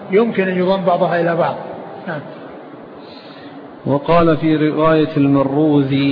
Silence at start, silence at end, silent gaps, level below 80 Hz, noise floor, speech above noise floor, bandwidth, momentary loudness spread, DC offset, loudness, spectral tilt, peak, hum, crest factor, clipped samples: 0 s; 0 s; none; -46 dBFS; -35 dBFS; 21 dB; 5.2 kHz; 21 LU; under 0.1%; -15 LUFS; -10.5 dB/octave; -2 dBFS; none; 14 dB; under 0.1%